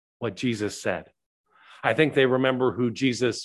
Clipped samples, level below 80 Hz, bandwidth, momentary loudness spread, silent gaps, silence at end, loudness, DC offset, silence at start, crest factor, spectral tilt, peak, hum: under 0.1%; -60 dBFS; 12 kHz; 9 LU; 1.26-1.44 s; 0 s; -25 LUFS; under 0.1%; 0.2 s; 20 dB; -5 dB/octave; -6 dBFS; none